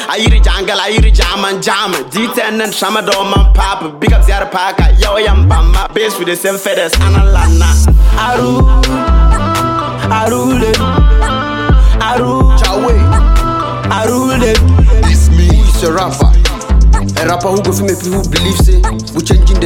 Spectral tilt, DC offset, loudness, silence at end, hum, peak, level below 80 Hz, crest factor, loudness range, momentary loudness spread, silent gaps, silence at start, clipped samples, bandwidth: -5 dB/octave; under 0.1%; -11 LUFS; 0 s; none; 0 dBFS; -10 dBFS; 8 dB; 2 LU; 5 LU; none; 0 s; under 0.1%; 16.5 kHz